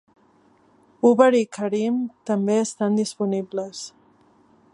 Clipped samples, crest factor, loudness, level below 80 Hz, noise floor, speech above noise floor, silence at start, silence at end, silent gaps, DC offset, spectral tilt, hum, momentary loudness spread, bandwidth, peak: under 0.1%; 22 dB; -22 LUFS; -74 dBFS; -58 dBFS; 37 dB; 1.05 s; 0.85 s; none; under 0.1%; -5.5 dB/octave; none; 14 LU; 11.5 kHz; -2 dBFS